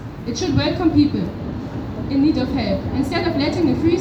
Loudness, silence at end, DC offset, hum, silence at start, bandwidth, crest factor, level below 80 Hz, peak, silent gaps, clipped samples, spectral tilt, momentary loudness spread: -20 LUFS; 0 s; under 0.1%; none; 0 s; 10.5 kHz; 16 dB; -36 dBFS; -4 dBFS; none; under 0.1%; -6.5 dB/octave; 11 LU